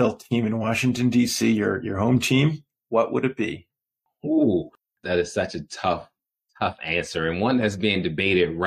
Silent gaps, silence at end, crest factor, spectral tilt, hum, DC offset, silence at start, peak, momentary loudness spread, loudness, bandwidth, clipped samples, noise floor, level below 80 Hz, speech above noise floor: none; 0 s; 14 dB; -5.5 dB/octave; none; under 0.1%; 0 s; -8 dBFS; 9 LU; -23 LUFS; 15.5 kHz; under 0.1%; -80 dBFS; -54 dBFS; 58 dB